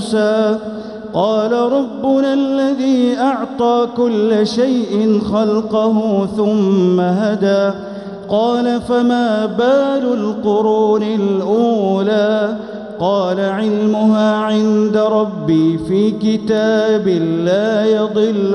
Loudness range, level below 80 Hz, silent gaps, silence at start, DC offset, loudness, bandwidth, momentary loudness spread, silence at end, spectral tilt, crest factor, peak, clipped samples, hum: 1 LU; -52 dBFS; none; 0 s; 0.1%; -15 LUFS; 10.5 kHz; 4 LU; 0 s; -7 dB/octave; 12 dB; -2 dBFS; under 0.1%; none